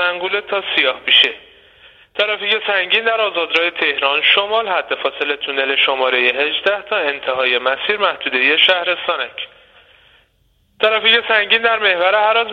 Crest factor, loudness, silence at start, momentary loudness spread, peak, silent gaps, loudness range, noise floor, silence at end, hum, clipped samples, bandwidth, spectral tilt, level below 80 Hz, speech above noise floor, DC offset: 16 dB; -15 LUFS; 0 s; 8 LU; 0 dBFS; none; 2 LU; -59 dBFS; 0 s; none; under 0.1%; 7.4 kHz; -3 dB/octave; -62 dBFS; 43 dB; under 0.1%